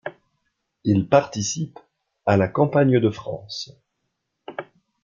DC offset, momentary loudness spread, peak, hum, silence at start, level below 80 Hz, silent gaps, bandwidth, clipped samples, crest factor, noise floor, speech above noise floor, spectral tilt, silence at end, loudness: under 0.1%; 19 LU; -2 dBFS; none; 0.05 s; -60 dBFS; none; 7.6 kHz; under 0.1%; 22 dB; -77 dBFS; 56 dB; -6 dB/octave; 0.4 s; -21 LUFS